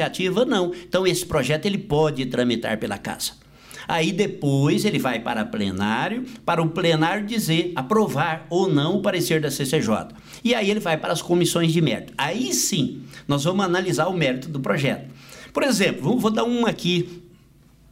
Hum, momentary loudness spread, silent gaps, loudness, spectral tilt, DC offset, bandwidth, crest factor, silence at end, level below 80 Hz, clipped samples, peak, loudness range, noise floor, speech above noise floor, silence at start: none; 7 LU; none; -22 LUFS; -4.5 dB/octave; under 0.1%; 16 kHz; 14 dB; 0.65 s; -54 dBFS; under 0.1%; -8 dBFS; 2 LU; -53 dBFS; 31 dB; 0 s